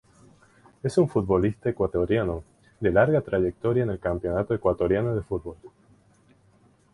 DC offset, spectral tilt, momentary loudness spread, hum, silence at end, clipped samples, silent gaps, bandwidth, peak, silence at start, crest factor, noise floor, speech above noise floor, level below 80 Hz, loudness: under 0.1%; -8.5 dB/octave; 9 LU; none; 1.25 s; under 0.1%; none; 11 kHz; -8 dBFS; 0.85 s; 18 dB; -60 dBFS; 36 dB; -46 dBFS; -25 LUFS